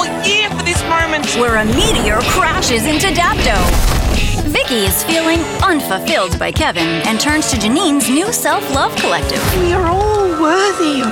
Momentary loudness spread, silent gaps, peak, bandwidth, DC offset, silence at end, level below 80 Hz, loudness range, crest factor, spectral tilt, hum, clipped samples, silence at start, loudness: 3 LU; none; -4 dBFS; 18 kHz; under 0.1%; 0 s; -22 dBFS; 1 LU; 10 dB; -3.5 dB/octave; none; under 0.1%; 0 s; -13 LUFS